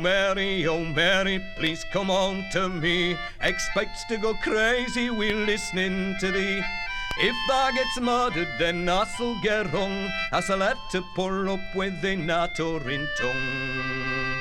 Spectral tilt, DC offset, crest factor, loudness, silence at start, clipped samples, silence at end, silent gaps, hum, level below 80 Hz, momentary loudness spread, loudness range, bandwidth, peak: -4 dB/octave; under 0.1%; 18 dB; -25 LUFS; 0 s; under 0.1%; 0 s; none; none; -40 dBFS; 6 LU; 2 LU; 15 kHz; -8 dBFS